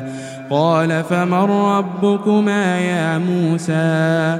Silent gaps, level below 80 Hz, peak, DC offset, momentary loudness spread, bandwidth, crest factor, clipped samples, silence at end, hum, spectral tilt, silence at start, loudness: none; -64 dBFS; -2 dBFS; under 0.1%; 3 LU; 12.5 kHz; 14 dB; under 0.1%; 0 s; none; -7 dB/octave; 0 s; -17 LUFS